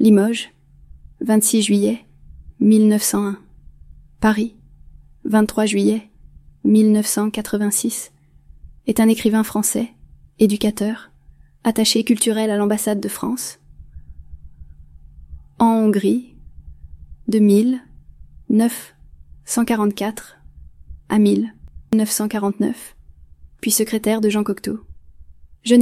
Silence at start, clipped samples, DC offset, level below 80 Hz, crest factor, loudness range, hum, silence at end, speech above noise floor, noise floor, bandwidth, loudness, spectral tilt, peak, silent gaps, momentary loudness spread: 0 s; under 0.1%; under 0.1%; -46 dBFS; 18 dB; 4 LU; none; 0 s; 31 dB; -48 dBFS; 16 kHz; -18 LUFS; -4.5 dB/octave; -2 dBFS; none; 14 LU